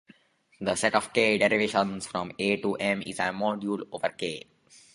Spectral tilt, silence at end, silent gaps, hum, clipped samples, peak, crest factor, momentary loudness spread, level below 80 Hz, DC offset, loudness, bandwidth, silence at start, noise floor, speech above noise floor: -4 dB/octave; 0.55 s; none; none; under 0.1%; -6 dBFS; 22 dB; 10 LU; -64 dBFS; under 0.1%; -27 LUFS; 11.5 kHz; 0.6 s; -60 dBFS; 32 dB